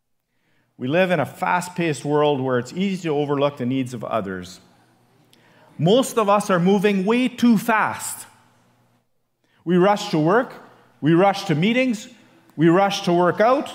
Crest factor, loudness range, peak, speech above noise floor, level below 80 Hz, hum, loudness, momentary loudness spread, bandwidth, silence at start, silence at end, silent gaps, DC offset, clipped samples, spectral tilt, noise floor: 16 dB; 4 LU; -4 dBFS; 50 dB; -70 dBFS; none; -20 LUFS; 11 LU; 16 kHz; 0.8 s; 0 s; none; under 0.1%; under 0.1%; -6 dB/octave; -69 dBFS